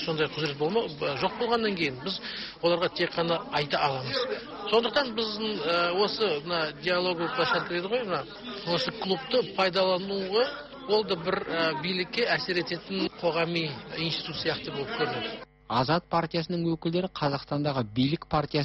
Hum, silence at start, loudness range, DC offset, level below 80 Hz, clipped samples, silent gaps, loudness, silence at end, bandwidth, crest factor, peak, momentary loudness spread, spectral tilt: none; 0 s; 2 LU; under 0.1%; -58 dBFS; under 0.1%; none; -28 LUFS; 0 s; 8.2 kHz; 16 dB; -12 dBFS; 6 LU; -6.5 dB/octave